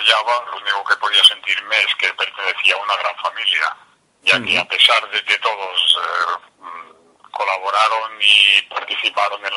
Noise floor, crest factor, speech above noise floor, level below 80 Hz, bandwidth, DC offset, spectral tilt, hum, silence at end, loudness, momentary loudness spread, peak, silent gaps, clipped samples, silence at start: -47 dBFS; 18 dB; 30 dB; -70 dBFS; 16 kHz; under 0.1%; 0 dB/octave; none; 0 s; -15 LUFS; 12 LU; 0 dBFS; none; under 0.1%; 0 s